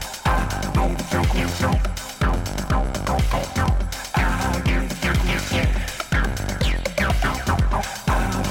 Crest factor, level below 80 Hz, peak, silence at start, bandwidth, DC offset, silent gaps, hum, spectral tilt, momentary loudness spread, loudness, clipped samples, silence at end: 14 dB; -24 dBFS; -6 dBFS; 0 s; 17 kHz; under 0.1%; none; none; -5 dB/octave; 3 LU; -23 LUFS; under 0.1%; 0 s